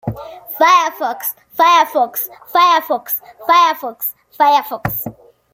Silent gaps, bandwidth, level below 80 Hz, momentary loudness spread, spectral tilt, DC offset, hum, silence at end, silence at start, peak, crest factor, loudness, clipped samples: none; 17 kHz; -52 dBFS; 12 LU; -3.5 dB/octave; under 0.1%; none; 0.4 s; 0.05 s; -2 dBFS; 14 dB; -15 LUFS; under 0.1%